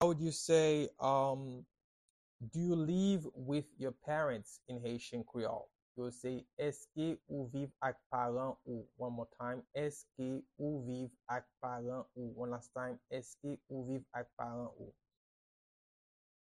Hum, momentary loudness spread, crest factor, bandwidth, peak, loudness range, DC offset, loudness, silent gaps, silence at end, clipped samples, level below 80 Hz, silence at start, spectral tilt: none; 13 LU; 22 dB; 12.5 kHz; -18 dBFS; 8 LU; under 0.1%; -40 LUFS; 1.84-2.39 s, 5.82-5.95 s, 6.53-6.57 s, 8.06-8.10 s, 14.33-14.37 s; 1.6 s; under 0.1%; -72 dBFS; 0 s; -6 dB/octave